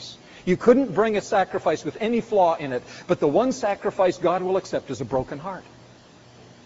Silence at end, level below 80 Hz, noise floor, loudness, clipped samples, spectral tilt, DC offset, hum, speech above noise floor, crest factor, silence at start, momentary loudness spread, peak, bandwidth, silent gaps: 1.05 s; -56 dBFS; -50 dBFS; -23 LUFS; under 0.1%; -5 dB/octave; under 0.1%; none; 27 dB; 20 dB; 0 s; 13 LU; -4 dBFS; 8 kHz; none